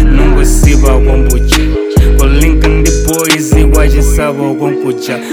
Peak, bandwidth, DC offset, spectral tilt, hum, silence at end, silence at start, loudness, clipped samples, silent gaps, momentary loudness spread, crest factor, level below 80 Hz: 0 dBFS; 16 kHz; under 0.1%; -5 dB/octave; none; 0 s; 0 s; -10 LUFS; 4%; none; 5 LU; 8 dB; -8 dBFS